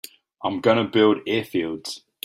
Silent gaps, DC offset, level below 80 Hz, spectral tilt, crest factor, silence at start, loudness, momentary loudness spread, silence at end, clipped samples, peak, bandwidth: none; under 0.1%; -64 dBFS; -5.5 dB/octave; 18 dB; 0.4 s; -22 LUFS; 14 LU; 0.25 s; under 0.1%; -4 dBFS; 16 kHz